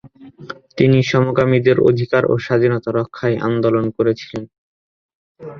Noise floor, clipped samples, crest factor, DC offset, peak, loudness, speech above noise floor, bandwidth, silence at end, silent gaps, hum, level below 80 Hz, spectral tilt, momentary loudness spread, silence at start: -39 dBFS; under 0.1%; 18 dB; under 0.1%; 0 dBFS; -16 LUFS; 24 dB; 7 kHz; 0 s; 4.58-5.09 s, 5.15-5.35 s; none; -52 dBFS; -8 dB/octave; 16 LU; 0.05 s